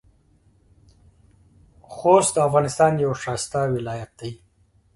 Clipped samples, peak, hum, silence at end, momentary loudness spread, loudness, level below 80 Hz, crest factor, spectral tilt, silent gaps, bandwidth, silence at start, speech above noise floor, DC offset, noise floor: under 0.1%; -2 dBFS; none; 0.6 s; 19 LU; -21 LUFS; -54 dBFS; 22 dB; -5 dB/octave; none; 11.5 kHz; 1.9 s; 40 dB; under 0.1%; -60 dBFS